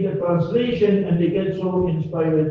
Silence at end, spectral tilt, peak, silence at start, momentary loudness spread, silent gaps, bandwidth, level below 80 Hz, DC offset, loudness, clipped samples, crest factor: 0 s; -10 dB/octave; -6 dBFS; 0 s; 4 LU; none; 5.6 kHz; -48 dBFS; under 0.1%; -20 LUFS; under 0.1%; 12 dB